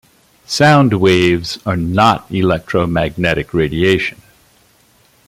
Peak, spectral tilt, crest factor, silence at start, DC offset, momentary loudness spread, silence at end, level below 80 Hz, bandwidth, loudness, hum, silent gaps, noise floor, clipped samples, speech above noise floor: 0 dBFS; -6 dB/octave; 14 dB; 0.5 s; under 0.1%; 8 LU; 1.15 s; -40 dBFS; 15.5 kHz; -14 LUFS; none; none; -52 dBFS; under 0.1%; 39 dB